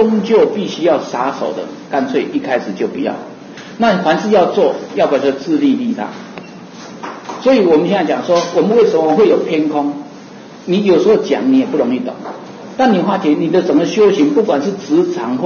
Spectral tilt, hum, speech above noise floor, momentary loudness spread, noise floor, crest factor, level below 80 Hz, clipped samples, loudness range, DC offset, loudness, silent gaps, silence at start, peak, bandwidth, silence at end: -6 dB/octave; none; 21 dB; 18 LU; -34 dBFS; 12 dB; -58 dBFS; under 0.1%; 3 LU; under 0.1%; -14 LUFS; none; 0 s; -2 dBFS; 7 kHz; 0 s